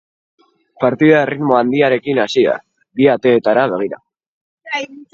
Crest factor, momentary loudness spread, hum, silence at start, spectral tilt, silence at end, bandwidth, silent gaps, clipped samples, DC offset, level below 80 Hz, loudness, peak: 16 dB; 12 LU; none; 0.8 s; -6.5 dB/octave; 0.1 s; 7.8 kHz; 4.26-4.57 s; under 0.1%; under 0.1%; -60 dBFS; -15 LUFS; 0 dBFS